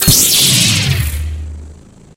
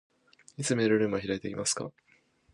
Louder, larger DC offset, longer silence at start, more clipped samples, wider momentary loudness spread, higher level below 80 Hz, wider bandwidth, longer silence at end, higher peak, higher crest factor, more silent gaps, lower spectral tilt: first, -9 LUFS vs -29 LUFS; neither; second, 0 s vs 0.6 s; first, 0.1% vs under 0.1%; first, 18 LU vs 12 LU; first, -26 dBFS vs -64 dBFS; first, over 20 kHz vs 11.5 kHz; second, 0.45 s vs 0.65 s; first, 0 dBFS vs -14 dBFS; about the same, 14 dB vs 18 dB; neither; second, -2 dB/octave vs -4 dB/octave